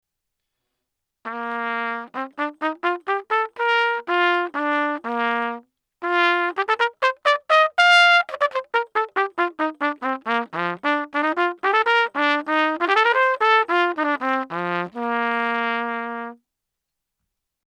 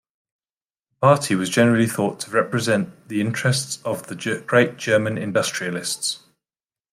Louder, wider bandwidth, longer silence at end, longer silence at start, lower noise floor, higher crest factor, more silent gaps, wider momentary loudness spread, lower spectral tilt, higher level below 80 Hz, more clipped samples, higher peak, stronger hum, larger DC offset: about the same, -20 LUFS vs -21 LUFS; second, 12 kHz vs 16 kHz; first, 1.45 s vs 0.75 s; first, 1.25 s vs 1 s; second, -82 dBFS vs under -90 dBFS; about the same, 20 dB vs 20 dB; neither; about the same, 10 LU vs 9 LU; about the same, -3.5 dB/octave vs -4.5 dB/octave; second, -80 dBFS vs -64 dBFS; neither; about the same, -2 dBFS vs -2 dBFS; neither; neither